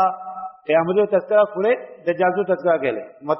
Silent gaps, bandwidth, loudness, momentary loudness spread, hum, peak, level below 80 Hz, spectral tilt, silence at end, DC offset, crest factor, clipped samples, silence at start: none; 5.8 kHz; -20 LUFS; 13 LU; none; -4 dBFS; -66 dBFS; -4.5 dB/octave; 0 s; under 0.1%; 16 dB; under 0.1%; 0 s